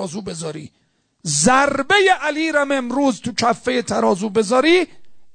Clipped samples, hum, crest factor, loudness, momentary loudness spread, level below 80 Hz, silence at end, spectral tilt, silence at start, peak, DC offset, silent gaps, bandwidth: under 0.1%; none; 16 dB; -17 LUFS; 14 LU; -52 dBFS; 0.05 s; -3.5 dB/octave; 0 s; -2 dBFS; under 0.1%; none; 9.4 kHz